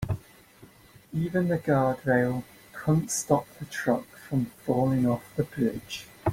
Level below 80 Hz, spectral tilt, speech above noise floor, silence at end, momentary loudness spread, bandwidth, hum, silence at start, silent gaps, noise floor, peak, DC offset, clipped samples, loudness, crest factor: -54 dBFS; -6 dB/octave; 27 dB; 0 s; 11 LU; 16.5 kHz; none; 0 s; none; -54 dBFS; -8 dBFS; under 0.1%; under 0.1%; -28 LUFS; 20 dB